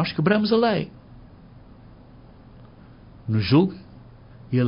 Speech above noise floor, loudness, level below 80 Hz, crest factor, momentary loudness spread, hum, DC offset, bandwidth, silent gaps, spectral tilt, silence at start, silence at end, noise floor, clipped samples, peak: 27 dB; -21 LUFS; -50 dBFS; 20 dB; 18 LU; none; under 0.1%; 5.4 kHz; none; -11.5 dB/octave; 0 s; 0 s; -47 dBFS; under 0.1%; -6 dBFS